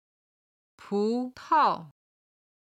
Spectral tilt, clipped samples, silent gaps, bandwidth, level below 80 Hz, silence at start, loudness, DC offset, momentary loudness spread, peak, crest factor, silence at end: -6 dB/octave; under 0.1%; none; 10.5 kHz; -74 dBFS; 0.85 s; -27 LUFS; under 0.1%; 10 LU; -12 dBFS; 18 dB; 0.8 s